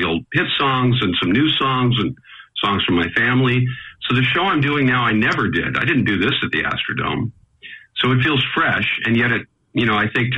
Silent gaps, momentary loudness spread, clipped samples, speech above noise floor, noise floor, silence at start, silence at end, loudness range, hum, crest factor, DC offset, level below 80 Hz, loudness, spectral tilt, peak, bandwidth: none; 9 LU; under 0.1%; 23 dB; -41 dBFS; 0 s; 0 s; 2 LU; none; 12 dB; under 0.1%; -46 dBFS; -18 LUFS; -7 dB/octave; -6 dBFS; 7.4 kHz